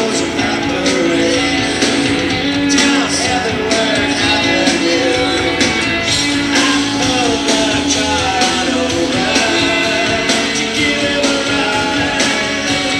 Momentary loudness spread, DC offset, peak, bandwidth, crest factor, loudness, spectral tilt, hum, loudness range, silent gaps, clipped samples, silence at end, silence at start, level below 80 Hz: 3 LU; under 0.1%; 0 dBFS; 14 kHz; 14 dB; -13 LUFS; -3 dB/octave; none; 1 LU; none; under 0.1%; 0 s; 0 s; -38 dBFS